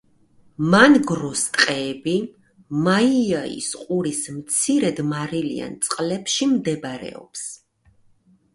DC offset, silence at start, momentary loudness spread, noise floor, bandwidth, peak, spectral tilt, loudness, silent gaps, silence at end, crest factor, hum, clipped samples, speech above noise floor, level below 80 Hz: under 0.1%; 0.6 s; 16 LU; -58 dBFS; 11.5 kHz; 0 dBFS; -4 dB/octave; -20 LUFS; none; 1 s; 22 dB; none; under 0.1%; 37 dB; -60 dBFS